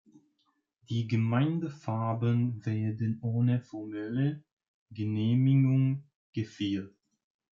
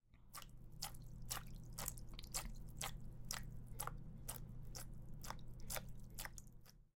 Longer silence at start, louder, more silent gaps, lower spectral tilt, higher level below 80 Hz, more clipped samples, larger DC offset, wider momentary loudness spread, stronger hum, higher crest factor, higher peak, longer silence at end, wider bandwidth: first, 0.9 s vs 0.05 s; first, -30 LUFS vs -51 LUFS; first, 4.52-4.57 s, 4.68-4.86 s, 6.15-6.33 s vs none; first, -9 dB/octave vs -2.5 dB/octave; second, -72 dBFS vs -54 dBFS; neither; neither; first, 13 LU vs 9 LU; neither; second, 14 dB vs 26 dB; first, -16 dBFS vs -24 dBFS; first, 0.65 s vs 0.1 s; second, 7 kHz vs 17 kHz